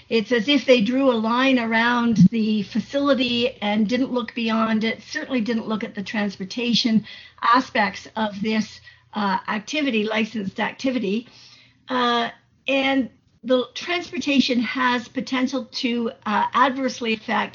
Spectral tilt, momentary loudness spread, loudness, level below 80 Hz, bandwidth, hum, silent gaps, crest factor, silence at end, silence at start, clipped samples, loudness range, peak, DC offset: -3.5 dB/octave; 8 LU; -22 LUFS; -62 dBFS; 7.4 kHz; none; none; 18 dB; 0.05 s; 0.1 s; under 0.1%; 5 LU; -4 dBFS; under 0.1%